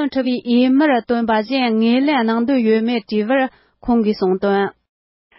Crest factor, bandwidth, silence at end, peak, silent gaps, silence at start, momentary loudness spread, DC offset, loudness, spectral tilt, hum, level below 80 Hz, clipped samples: 12 dB; 5.8 kHz; 0.7 s; -4 dBFS; none; 0 s; 5 LU; under 0.1%; -17 LUFS; -10.5 dB/octave; none; -52 dBFS; under 0.1%